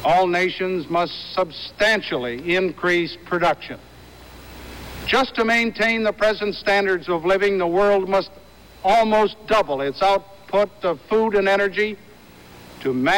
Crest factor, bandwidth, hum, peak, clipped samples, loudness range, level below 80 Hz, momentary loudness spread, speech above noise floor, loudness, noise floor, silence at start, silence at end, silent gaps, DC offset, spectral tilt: 12 dB; 17 kHz; none; -8 dBFS; under 0.1%; 3 LU; -48 dBFS; 10 LU; 25 dB; -20 LUFS; -45 dBFS; 0 s; 0 s; none; under 0.1%; -5 dB/octave